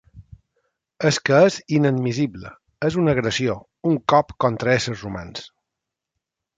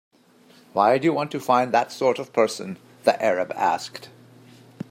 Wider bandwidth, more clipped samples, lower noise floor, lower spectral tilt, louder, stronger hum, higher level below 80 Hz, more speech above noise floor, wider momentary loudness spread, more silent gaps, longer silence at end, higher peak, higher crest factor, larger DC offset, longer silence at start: second, 9.2 kHz vs 16 kHz; neither; first, -84 dBFS vs -54 dBFS; about the same, -5.5 dB/octave vs -5 dB/octave; about the same, -20 LUFS vs -22 LUFS; neither; first, -52 dBFS vs -74 dBFS; first, 64 dB vs 32 dB; about the same, 15 LU vs 15 LU; neither; first, 1.1 s vs 0.85 s; about the same, -4 dBFS vs -4 dBFS; about the same, 18 dB vs 20 dB; neither; second, 0.15 s vs 0.75 s